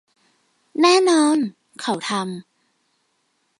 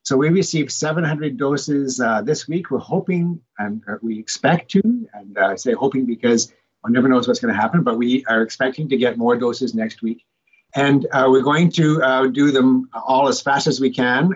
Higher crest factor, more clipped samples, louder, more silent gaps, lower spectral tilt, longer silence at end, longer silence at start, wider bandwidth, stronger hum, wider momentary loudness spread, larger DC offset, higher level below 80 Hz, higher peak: about the same, 18 dB vs 14 dB; neither; about the same, -19 LUFS vs -18 LUFS; neither; second, -3.5 dB/octave vs -5.5 dB/octave; first, 1.2 s vs 0 s; first, 0.75 s vs 0.05 s; first, 11.5 kHz vs 8 kHz; neither; first, 16 LU vs 10 LU; neither; second, -78 dBFS vs -66 dBFS; about the same, -4 dBFS vs -4 dBFS